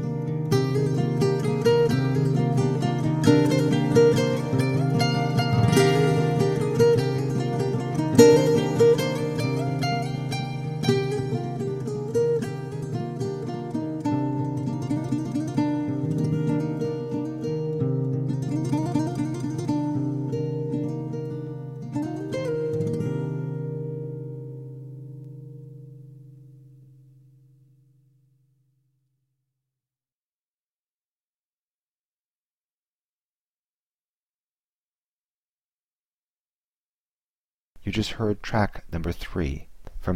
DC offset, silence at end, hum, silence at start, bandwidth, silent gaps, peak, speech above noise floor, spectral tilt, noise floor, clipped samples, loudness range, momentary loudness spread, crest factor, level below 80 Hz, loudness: under 0.1%; 0 s; none; 0 s; 14 kHz; 30.12-37.73 s; -2 dBFS; over 63 dB; -7 dB/octave; under -90 dBFS; under 0.1%; 12 LU; 13 LU; 24 dB; -48 dBFS; -24 LUFS